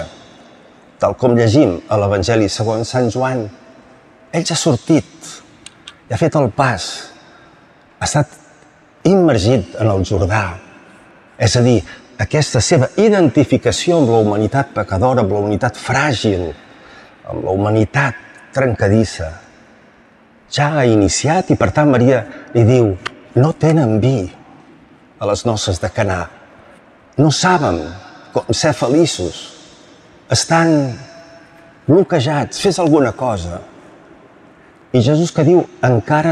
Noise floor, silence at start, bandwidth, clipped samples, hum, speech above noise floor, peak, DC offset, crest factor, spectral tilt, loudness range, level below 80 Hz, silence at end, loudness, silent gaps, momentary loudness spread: -48 dBFS; 0 s; 12 kHz; under 0.1%; none; 34 dB; -2 dBFS; under 0.1%; 14 dB; -5.5 dB/octave; 5 LU; -46 dBFS; 0 s; -15 LUFS; none; 14 LU